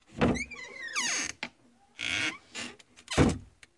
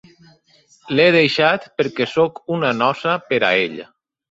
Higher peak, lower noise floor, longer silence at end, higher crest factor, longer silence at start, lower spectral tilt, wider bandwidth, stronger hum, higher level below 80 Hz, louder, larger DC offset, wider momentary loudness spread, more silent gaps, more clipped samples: second, -10 dBFS vs -2 dBFS; first, -63 dBFS vs -55 dBFS; second, 0.3 s vs 0.5 s; about the same, 22 dB vs 18 dB; second, 0.1 s vs 0.85 s; second, -3.5 dB/octave vs -5.5 dB/octave; first, 11.5 kHz vs 7.8 kHz; neither; first, -46 dBFS vs -62 dBFS; second, -31 LUFS vs -17 LUFS; neither; first, 14 LU vs 9 LU; neither; neither